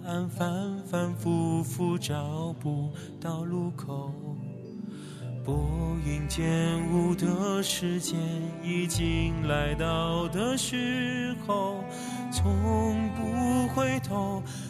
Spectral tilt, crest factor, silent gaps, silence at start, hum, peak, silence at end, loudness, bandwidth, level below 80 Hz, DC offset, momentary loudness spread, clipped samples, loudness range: -5.5 dB/octave; 16 dB; none; 0 s; none; -12 dBFS; 0 s; -30 LUFS; 14 kHz; -44 dBFS; under 0.1%; 9 LU; under 0.1%; 5 LU